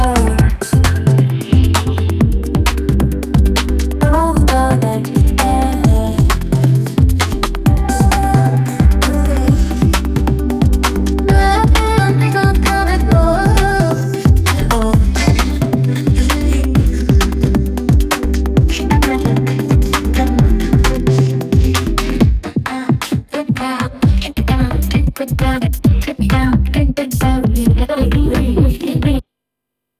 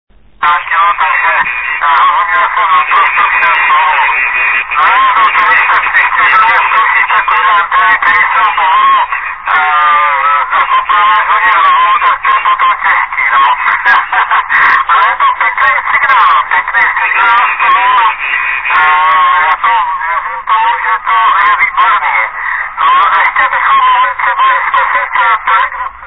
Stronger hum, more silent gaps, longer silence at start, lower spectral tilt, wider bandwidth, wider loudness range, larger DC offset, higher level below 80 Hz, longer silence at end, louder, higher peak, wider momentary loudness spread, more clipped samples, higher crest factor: neither; neither; second, 0 s vs 0.4 s; first, -6 dB/octave vs -3 dB/octave; first, 15.5 kHz vs 5.4 kHz; about the same, 3 LU vs 2 LU; second, under 0.1% vs 0.8%; first, -16 dBFS vs -44 dBFS; first, 0.8 s vs 0 s; second, -14 LUFS vs -8 LUFS; about the same, 0 dBFS vs 0 dBFS; about the same, 4 LU vs 4 LU; second, under 0.1% vs 0.2%; about the same, 12 dB vs 8 dB